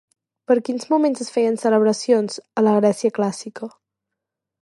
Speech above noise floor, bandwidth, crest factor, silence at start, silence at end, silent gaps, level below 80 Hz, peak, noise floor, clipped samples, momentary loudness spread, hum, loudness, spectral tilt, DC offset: 64 dB; 11.5 kHz; 16 dB; 0.5 s; 0.95 s; none; -76 dBFS; -4 dBFS; -83 dBFS; under 0.1%; 12 LU; none; -19 LUFS; -5.5 dB/octave; under 0.1%